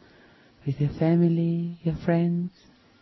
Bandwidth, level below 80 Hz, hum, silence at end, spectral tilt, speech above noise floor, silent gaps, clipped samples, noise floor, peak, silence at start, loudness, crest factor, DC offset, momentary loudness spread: 5.8 kHz; -52 dBFS; none; 0.55 s; -10.5 dB/octave; 31 dB; none; under 0.1%; -55 dBFS; -12 dBFS; 0.65 s; -25 LUFS; 14 dB; under 0.1%; 11 LU